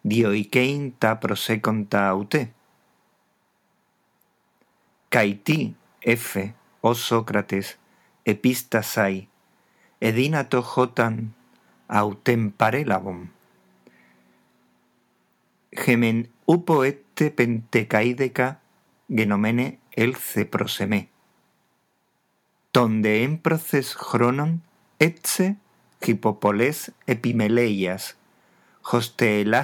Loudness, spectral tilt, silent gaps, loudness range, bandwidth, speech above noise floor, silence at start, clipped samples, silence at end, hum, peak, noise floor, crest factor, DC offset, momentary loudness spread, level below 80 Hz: -23 LUFS; -5.5 dB/octave; none; 5 LU; 20 kHz; 47 dB; 0.05 s; under 0.1%; 0 s; none; 0 dBFS; -69 dBFS; 24 dB; under 0.1%; 8 LU; -74 dBFS